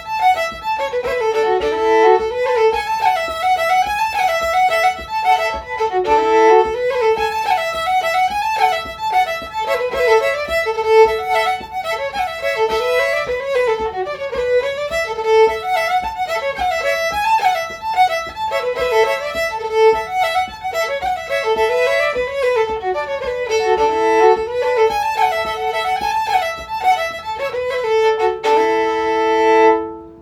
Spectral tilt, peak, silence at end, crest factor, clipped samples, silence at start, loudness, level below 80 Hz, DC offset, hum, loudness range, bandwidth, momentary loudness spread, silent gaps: -3 dB/octave; 0 dBFS; 0 s; 16 dB; under 0.1%; 0 s; -17 LUFS; -46 dBFS; under 0.1%; none; 3 LU; 19 kHz; 8 LU; none